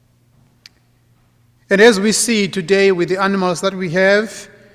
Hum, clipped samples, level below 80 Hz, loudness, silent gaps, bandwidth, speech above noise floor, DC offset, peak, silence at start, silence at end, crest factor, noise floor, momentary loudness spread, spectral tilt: none; under 0.1%; -58 dBFS; -14 LUFS; none; 15.5 kHz; 41 dB; under 0.1%; 0 dBFS; 1.7 s; 0.3 s; 16 dB; -55 dBFS; 8 LU; -4 dB/octave